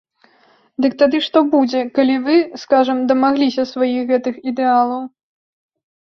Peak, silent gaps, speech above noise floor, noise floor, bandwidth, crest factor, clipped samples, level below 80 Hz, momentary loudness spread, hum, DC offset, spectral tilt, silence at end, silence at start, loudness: -2 dBFS; none; 39 dB; -54 dBFS; 6.4 kHz; 16 dB; under 0.1%; -62 dBFS; 6 LU; none; under 0.1%; -5 dB/octave; 0.95 s; 0.8 s; -16 LUFS